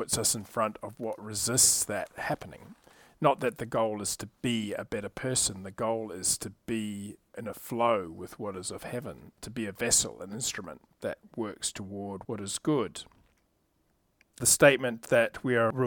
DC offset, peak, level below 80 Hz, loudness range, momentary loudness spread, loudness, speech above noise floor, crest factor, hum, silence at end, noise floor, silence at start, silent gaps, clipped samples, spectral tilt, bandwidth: under 0.1%; -6 dBFS; -60 dBFS; 7 LU; 17 LU; -29 LUFS; 42 dB; 24 dB; none; 0 s; -72 dBFS; 0 s; none; under 0.1%; -3 dB/octave; 19 kHz